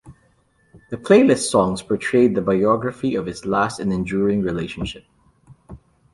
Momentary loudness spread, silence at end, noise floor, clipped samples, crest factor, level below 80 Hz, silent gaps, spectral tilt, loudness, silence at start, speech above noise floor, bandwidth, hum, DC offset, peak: 14 LU; 0.4 s; -60 dBFS; under 0.1%; 18 dB; -48 dBFS; none; -5.5 dB/octave; -19 LUFS; 0.05 s; 41 dB; 11.5 kHz; none; under 0.1%; -2 dBFS